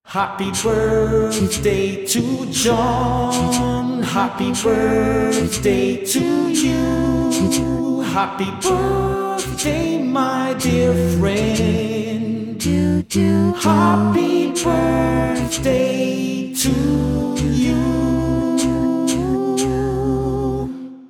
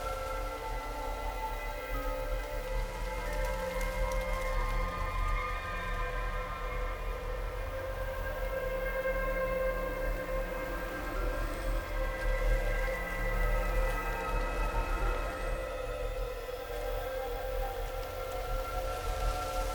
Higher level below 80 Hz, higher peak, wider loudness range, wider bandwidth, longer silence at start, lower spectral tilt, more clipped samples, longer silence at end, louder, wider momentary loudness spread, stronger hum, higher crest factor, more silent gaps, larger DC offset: about the same, -34 dBFS vs -36 dBFS; first, -4 dBFS vs -18 dBFS; about the same, 2 LU vs 3 LU; about the same, 18.5 kHz vs over 20 kHz; about the same, 0.05 s vs 0 s; about the same, -5 dB/octave vs -5 dB/octave; neither; about the same, 0 s vs 0 s; first, -18 LUFS vs -36 LUFS; about the same, 4 LU vs 5 LU; neither; about the same, 14 dB vs 16 dB; neither; neither